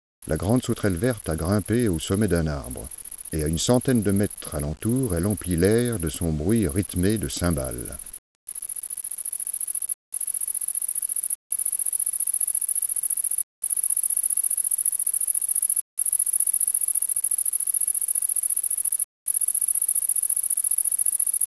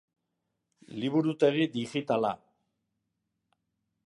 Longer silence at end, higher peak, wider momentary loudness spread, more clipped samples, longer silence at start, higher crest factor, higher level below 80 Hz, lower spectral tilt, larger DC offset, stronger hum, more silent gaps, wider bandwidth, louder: second, 0.15 s vs 1.7 s; first, -4 dBFS vs -12 dBFS; about the same, 10 LU vs 12 LU; neither; second, 0.2 s vs 0.9 s; about the same, 20 dB vs 20 dB; first, -44 dBFS vs -78 dBFS; second, -4 dB/octave vs -6.5 dB/octave; neither; neither; first, 8.18-8.47 s, 9.94-10.12 s, 11.35-11.50 s, 13.43-13.62 s, 15.81-15.97 s, 19.04-19.26 s vs none; about the same, 11 kHz vs 11 kHz; first, -20 LUFS vs -29 LUFS